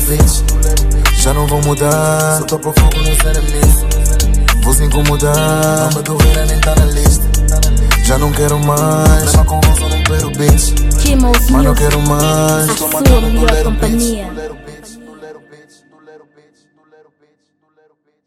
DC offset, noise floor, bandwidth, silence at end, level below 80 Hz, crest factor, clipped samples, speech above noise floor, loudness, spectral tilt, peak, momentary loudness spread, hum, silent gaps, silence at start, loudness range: under 0.1%; -60 dBFS; 16 kHz; 2.95 s; -14 dBFS; 10 dB; under 0.1%; 50 dB; -12 LUFS; -4.5 dB/octave; 0 dBFS; 4 LU; 50 Hz at -20 dBFS; none; 0 s; 4 LU